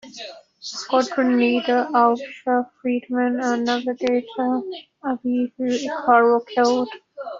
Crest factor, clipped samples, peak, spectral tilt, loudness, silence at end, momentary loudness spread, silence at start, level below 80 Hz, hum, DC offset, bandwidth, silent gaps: 18 dB; under 0.1%; -4 dBFS; -4 dB/octave; -21 LUFS; 0 s; 14 LU; 0.05 s; -68 dBFS; none; under 0.1%; 7.6 kHz; none